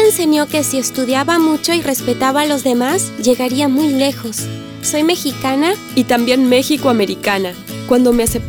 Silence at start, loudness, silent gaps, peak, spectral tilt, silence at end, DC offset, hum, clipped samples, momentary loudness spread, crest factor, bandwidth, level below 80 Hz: 0 s; -15 LUFS; none; -2 dBFS; -3.5 dB/octave; 0 s; under 0.1%; none; under 0.1%; 6 LU; 14 dB; 20 kHz; -42 dBFS